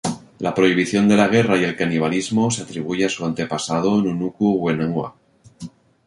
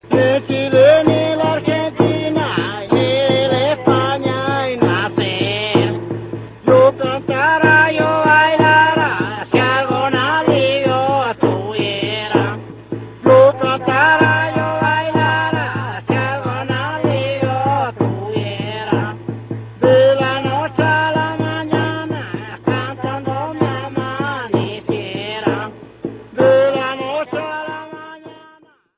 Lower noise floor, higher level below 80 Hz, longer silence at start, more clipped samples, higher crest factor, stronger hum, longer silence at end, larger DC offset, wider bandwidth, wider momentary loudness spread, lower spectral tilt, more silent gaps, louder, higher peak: second, -39 dBFS vs -49 dBFS; about the same, -54 dBFS vs -50 dBFS; about the same, 0.05 s vs 0.05 s; neither; about the same, 18 dB vs 16 dB; neither; second, 0.4 s vs 0.65 s; neither; first, 11.5 kHz vs 4 kHz; about the same, 12 LU vs 13 LU; second, -5.5 dB/octave vs -10 dB/octave; neither; second, -19 LUFS vs -16 LUFS; about the same, -2 dBFS vs 0 dBFS